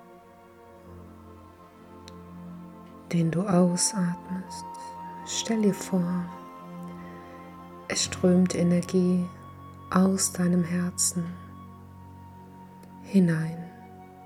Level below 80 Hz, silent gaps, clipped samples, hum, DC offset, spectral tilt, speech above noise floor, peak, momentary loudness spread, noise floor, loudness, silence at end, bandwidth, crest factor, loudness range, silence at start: -64 dBFS; none; under 0.1%; none; under 0.1%; -5 dB/octave; 26 dB; -8 dBFS; 24 LU; -51 dBFS; -26 LUFS; 0 s; 14.5 kHz; 20 dB; 6 LU; 0 s